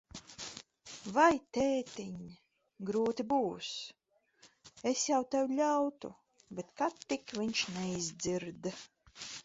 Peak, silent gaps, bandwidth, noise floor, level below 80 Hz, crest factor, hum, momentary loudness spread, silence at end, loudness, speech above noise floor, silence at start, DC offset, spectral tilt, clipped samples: -14 dBFS; none; 8 kHz; -66 dBFS; -68 dBFS; 22 dB; none; 18 LU; 0.05 s; -34 LUFS; 32 dB; 0.15 s; under 0.1%; -3.5 dB/octave; under 0.1%